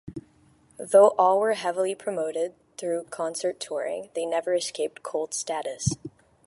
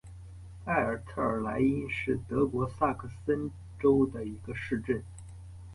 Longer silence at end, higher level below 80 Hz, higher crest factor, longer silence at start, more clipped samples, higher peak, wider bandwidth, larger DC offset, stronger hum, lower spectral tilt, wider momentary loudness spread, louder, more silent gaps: first, 0.4 s vs 0 s; second, -58 dBFS vs -50 dBFS; about the same, 20 dB vs 18 dB; about the same, 0.05 s vs 0.05 s; neither; first, -6 dBFS vs -14 dBFS; about the same, 11.5 kHz vs 11.5 kHz; neither; neither; second, -4 dB/octave vs -8 dB/octave; second, 15 LU vs 20 LU; first, -26 LUFS vs -31 LUFS; neither